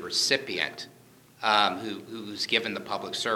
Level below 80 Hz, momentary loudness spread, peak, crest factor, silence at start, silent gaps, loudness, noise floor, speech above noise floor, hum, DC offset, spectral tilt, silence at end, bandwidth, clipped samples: -74 dBFS; 15 LU; -6 dBFS; 24 dB; 0 s; none; -27 LUFS; -54 dBFS; 25 dB; none; under 0.1%; -1.5 dB/octave; 0 s; 19.5 kHz; under 0.1%